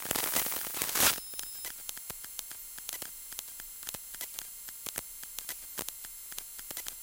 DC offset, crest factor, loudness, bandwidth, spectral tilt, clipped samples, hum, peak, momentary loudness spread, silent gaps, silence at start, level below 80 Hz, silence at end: under 0.1%; 28 dB; -34 LUFS; 17 kHz; 0 dB/octave; under 0.1%; none; -10 dBFS; 14 LU; none; 0 s; -62 dBFS; 0 s